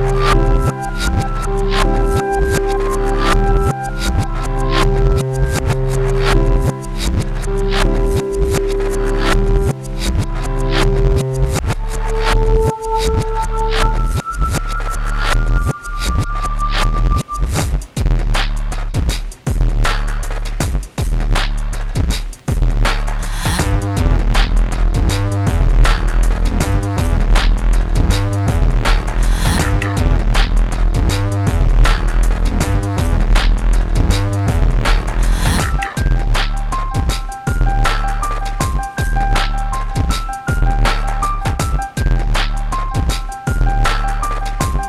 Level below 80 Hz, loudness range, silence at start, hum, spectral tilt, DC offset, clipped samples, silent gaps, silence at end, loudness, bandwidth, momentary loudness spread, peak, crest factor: -16 dBFS; 3 LU; 0 s; none; -5.5 dB/octave; under 0.1%; under 0.1%; none; 0 s; -18 LUFS; 13.5 kHz; 6 LU; 0 dBFS; 14 dB